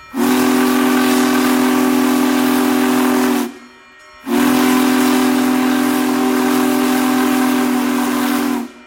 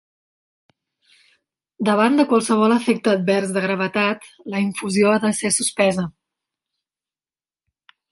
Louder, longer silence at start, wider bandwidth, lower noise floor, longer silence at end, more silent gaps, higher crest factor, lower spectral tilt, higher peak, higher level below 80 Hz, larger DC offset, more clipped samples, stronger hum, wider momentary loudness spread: first, -14 LUFS vs -19 LUFS; second, 0 s vs 1.8 s; first, 17 kHz vs 11.5 kHz; second, -42 dBFS vs under -90 dBFS; second, 0.15 s vs 2 s; neither; second, 10 dB vs 18 dB; about the same, -3.5 dB/octave vs -4.5 dB/octave; about the same, -4 dBFS vs -4 dBFS; first, -54 dBFS vs -64 dBFS; neither; neither; neither; second, 3 LU vs 8 LU